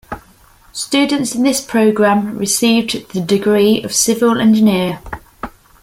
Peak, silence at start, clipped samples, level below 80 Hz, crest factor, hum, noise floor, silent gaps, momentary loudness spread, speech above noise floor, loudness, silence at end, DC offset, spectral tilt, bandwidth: -2 dBFS; 0.1 s; under 0.1%; -46 dBFS; 14 dB; none; -47 dBFS; none; 19 LU; 33 dB; -14 LUFS; 0.35 s; under 0.1%; -4 dB/octave; 16.5 kHz